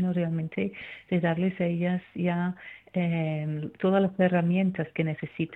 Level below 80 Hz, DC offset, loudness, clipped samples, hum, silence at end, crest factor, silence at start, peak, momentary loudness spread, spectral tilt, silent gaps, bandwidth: -64 dBFS; under 0.1%; -28 LUFS; under 0.1%; none; 0 s; 18 dB; 0 s; -10 dBFS; 9 LU; -10 dB/octave; none; 4 kHz